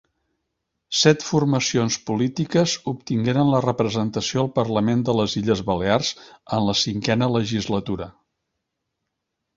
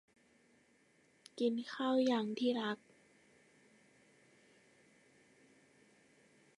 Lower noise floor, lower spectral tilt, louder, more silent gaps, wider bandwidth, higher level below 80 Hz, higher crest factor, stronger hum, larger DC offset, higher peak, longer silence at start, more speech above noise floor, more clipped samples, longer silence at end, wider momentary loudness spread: first, -79 dBFS vs -71 dBFS; about the same, -5 dB/octave vs -5 dB/octave; first, -21 LUFS vs -37 LUFS; neither; second, 7.8 kHz vs 11 kHz; first, -52 dBFS vs under -90 dBFS; about the same, 20 dB vs 18 dB; neither; neither; first, -2 dBFS vs -24 dBFS; second, 0.9 s vs 1.35 s; first, 58 dB vs 36 dB; neither; second, 1.45 s vs 3.85 s; second, 7 LU vs 11 LU